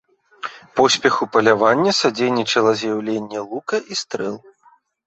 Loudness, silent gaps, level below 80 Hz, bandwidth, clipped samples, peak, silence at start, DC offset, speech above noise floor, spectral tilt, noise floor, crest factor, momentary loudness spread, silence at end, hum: -18 LUFS; none; -62 dBFS; 8.2 kHz; under 0.1%; -2 dBFS; 0.45 s; under 0.1%; 37 dB; -3.5 dB/octave; -55 dBFS; 18 dB; 13 LU; 0.7 s; none